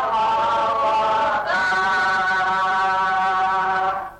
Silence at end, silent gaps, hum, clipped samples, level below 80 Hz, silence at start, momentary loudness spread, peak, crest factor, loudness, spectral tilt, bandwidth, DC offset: 0 s; none; none; under 0.1%; -54 dBFS; 0 s; 2 LU; -12 dBFS; 8 dB; -19 LUFS; -3 dB/octave; 10.5 kHz; under 0.1%